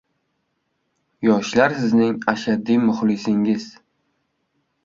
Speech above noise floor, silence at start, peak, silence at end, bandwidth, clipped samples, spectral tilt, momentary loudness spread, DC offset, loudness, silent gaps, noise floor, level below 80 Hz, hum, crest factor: 53 dB; 1.2 s; -2 dBFS; 1.15 s; 7.6 kHz; under 0.1%; -6 dB/octave; 5 LU; under 0.1%; -19 LUFS; none; -72 dBFS; -60 dBFS; none; 20 dB